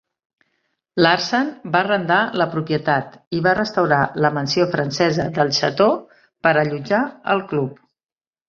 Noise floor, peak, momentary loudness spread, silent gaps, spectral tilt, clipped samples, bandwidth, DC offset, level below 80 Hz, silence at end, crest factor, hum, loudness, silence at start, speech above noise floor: -71 dBFS; -2 dBFS; 5 LU; 3.27-3.31 s; -5.5 dB/octave; under 0.1%; 7.4 kHz; under 0.1%; -56 dBFS; 0.75 s; 18 dB; none; -19 LUFS; 0.95 s; 52 dB